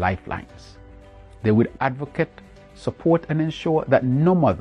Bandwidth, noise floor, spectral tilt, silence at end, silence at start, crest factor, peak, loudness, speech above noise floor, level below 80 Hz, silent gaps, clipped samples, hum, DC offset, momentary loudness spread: 9.6 kHz; -44 dBFS; -8.5 dB/octave; 0 s; 0 s; 20 dB; -2 dBFS; -22 LUFS; 23 dB; -48 dBFS; none; under 0.1%; none; under 0.1%; 13 LU